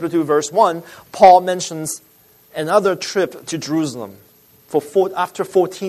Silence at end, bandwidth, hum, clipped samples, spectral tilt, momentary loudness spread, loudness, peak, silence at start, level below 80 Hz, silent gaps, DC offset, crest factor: 0 s; 13.5 kHz; none; under 0.1%; -4.5 dB/octave; 19 LU; -17 LUFS; 0 dBFS; 0 s; -62 dBFS; none; under 0.1%; 18 dB